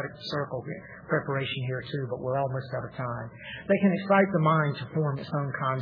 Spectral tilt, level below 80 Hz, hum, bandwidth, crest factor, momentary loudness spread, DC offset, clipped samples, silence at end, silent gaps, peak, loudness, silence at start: -9 dB/octave; -62 dBFS; none; 5.4 kHz; 18 dB; 13 LU; under 0.1%; under 0.1%; 0 s; none; -10 dBFS; -28 LUFS; 0 s